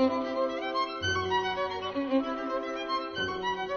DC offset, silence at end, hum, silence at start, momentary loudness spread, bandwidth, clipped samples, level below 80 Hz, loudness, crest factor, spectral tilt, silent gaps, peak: under 0.1%; 0 s; none; 0 s; 4 LU; 6.8 kHz; under 0.1%; -60 dBFS; -31 LUFS; 16 dB; -4.5 dB/octave; none; -14 dBFS